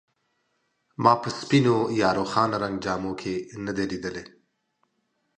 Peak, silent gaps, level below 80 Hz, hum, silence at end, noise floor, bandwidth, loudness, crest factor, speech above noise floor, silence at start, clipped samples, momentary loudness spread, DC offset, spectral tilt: -4 dBFS; none; -58 dBFS; none; 1.1 s; -74 dBFS; 9.8 kHz; -25 LUFS; 22 dB; 50 dB; 1 s; under 0.1%; 11 LU; under 0.1%; -6 dB/octave